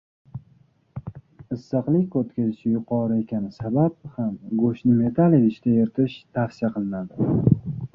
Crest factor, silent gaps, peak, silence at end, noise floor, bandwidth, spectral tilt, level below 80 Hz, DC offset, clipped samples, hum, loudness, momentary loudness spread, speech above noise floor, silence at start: 20 dB; none; -4 dBFS; 0.05 s; -58 dBFS; 5.8 kHz; -10.5 dB/octave; -52 dBFS; under 0.1%; under 0.1%; none; -23 LUFS; 19 LU; 36 dB; 0.35 s